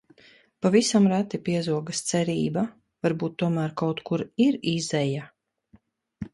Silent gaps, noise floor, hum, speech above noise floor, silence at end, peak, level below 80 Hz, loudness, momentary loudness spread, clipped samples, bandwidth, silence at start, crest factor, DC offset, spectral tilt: none; -60 dBFS; none; 36 dB; 0.05 s; -6 dBFS; -62 dBFS; -25 LUFS; 9 LU; under 0.1%; 11.5 kHz; 0.6 s; 18 dB; under 0.1%; -5.5 dB/octave